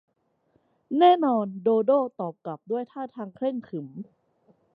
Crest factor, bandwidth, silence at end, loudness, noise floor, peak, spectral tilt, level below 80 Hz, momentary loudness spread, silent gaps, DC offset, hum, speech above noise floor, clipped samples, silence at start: 20 dB; 5 kHz; 0.7 s; -25 LUFS; -69 dBFS; -6 dBFS; -9.5 dB/octave; -80 dBFS; 19 LU; none; under 0.1%; none; 44 dB; under 0.1%; 0.9 s